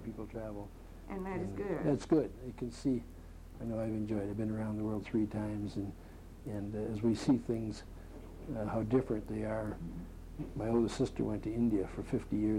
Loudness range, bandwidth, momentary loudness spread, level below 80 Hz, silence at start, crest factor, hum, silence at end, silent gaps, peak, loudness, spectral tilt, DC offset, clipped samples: 2 LU; 15.5 kHz; 16 LU; -52 dBFS; 0 s; 18 dB; none; 0 s; none; -18 dBFS; -36 LUFS; -7.5 dB/octave; under 0.1%; under 0.1%